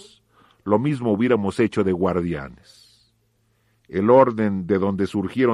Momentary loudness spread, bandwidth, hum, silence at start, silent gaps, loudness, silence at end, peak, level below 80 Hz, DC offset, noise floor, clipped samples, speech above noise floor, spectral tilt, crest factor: 13 LU; 11 kHz; none; 0.65 s; none; -21 LUFS; 0 s; -2 dBFS; -54 dBFS; under 0.1%; -65 dBFS; under 0.1%; 46 dB; -8 dB/octave; 18 dB